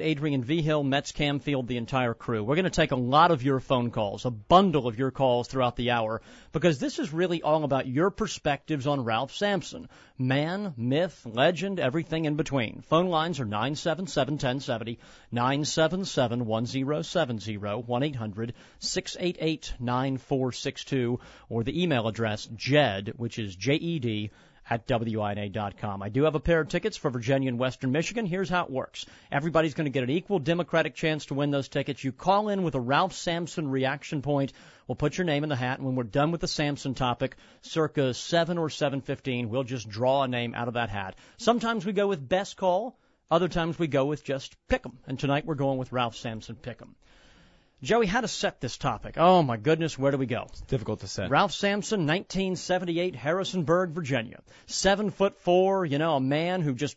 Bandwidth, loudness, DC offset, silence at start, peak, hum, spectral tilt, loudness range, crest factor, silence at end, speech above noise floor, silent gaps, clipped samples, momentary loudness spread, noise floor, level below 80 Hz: 8 kHz; -28 LUFS; under 0.1%; 0 s; -6 dBFS; none; -5.5 dB/octave; 4 LU; 20 dB; 0.05 s; 31 dB; none; under 0.1%; 9 LU; -59 dBFS; -50 dBFS